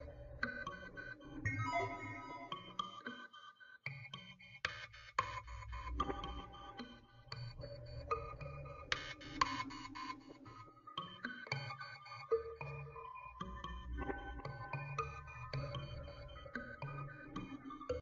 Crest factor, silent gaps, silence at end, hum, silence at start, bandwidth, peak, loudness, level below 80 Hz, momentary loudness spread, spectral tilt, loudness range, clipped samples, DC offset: 28 dB; none; 0 s; none; 0 s; 7.4 kHz; -18 dBFS; -46 LUFS; -56 dBFS; 12 LU; -3.5 dB/octave; 3 LU; under 0.1%; under 0.1%